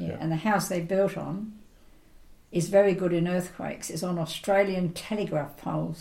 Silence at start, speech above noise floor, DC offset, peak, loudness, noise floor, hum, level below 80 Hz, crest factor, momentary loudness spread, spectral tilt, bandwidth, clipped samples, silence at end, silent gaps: 0 s; 27 dB; under 0.1%; -10 dBFS; -28 LUFS; -54 dBFS; none; -56 dBFS; 18 dB; 11 LU; -6 dB/octave; 16.5 kHz; under 0.1%; 0 s; none